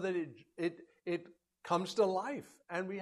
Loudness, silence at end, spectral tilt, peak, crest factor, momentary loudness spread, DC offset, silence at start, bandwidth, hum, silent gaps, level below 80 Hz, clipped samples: -38 LUFS; 0 s; -5.5 dB/octave; -18 dBFS; 20 dB; 13 LU; under 0.1%; 0 s; 13 kHz; none; none; -82 dBFS; under 0.1%